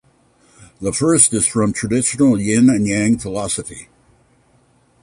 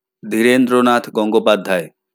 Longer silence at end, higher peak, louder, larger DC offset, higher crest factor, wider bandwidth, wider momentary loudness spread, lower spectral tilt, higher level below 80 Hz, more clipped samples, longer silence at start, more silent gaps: first, 1.2 s vs 0.25 s; about the same, 0 dBFS vs 0 dBFS; about the same, -16 LUFS vs -15 LUFS; neither; about the same, 18 dB vs 14 dB; second, 11.5 kHz vs 18.5 kHz; first, 12 LU vs 8 LU; about the same, -4.5 dB/octave vs -5 dB/octave; first, -46 dBFS vs -70 dBFS; neither; first, 0.8 s vs 0.25 s; neither